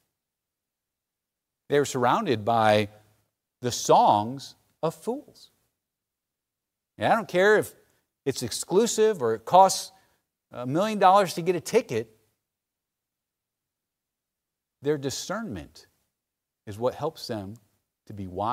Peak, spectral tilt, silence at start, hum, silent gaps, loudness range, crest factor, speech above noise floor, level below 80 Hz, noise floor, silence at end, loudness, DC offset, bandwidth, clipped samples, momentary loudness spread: -4 dBFS; -4 dB/octave; 1.7 s; none; none; 12 LU; 22 dB; 63 dB; -66 dBFS; -87 dBFS; 0 s; -24 LUFS; under 0.1%; 16 kHz; under 0.1%; 18 LU